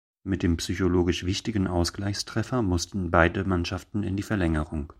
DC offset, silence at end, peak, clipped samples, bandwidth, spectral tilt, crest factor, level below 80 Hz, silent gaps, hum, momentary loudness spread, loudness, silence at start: under 0.1%; 0.05 s; -4 dBFS; under 0.1%; 14.5 kHz; -5.5 dB/octave; 22 dB; -40 dBFS; none; none; 7 LU; -26 LUFS; 0.25 s